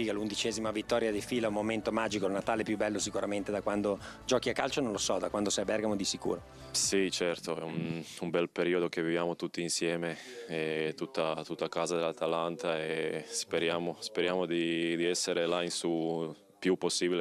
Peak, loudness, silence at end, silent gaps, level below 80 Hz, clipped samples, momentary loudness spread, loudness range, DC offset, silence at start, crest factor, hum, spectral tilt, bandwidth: -12 dBFS; -33 LUFS; 0 s; none; -62 dBFS; under 0.1%; 6 LU; 2 LU; under 0.1%; 0 s; 20 dB; none; -3.5 dB/octave; 14.5 kHz